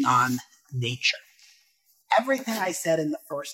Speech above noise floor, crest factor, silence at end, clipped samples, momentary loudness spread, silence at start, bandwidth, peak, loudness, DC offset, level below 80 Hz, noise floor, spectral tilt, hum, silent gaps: 40 dB; 18 dB; 0 s; under 0.1%; 10 LU; 0 s; 16.5 kHz; -8 dBFS; -26 LUFS; under 0.1%; -72 dBFS; -65 dBFS; -4 dB/octave; none; none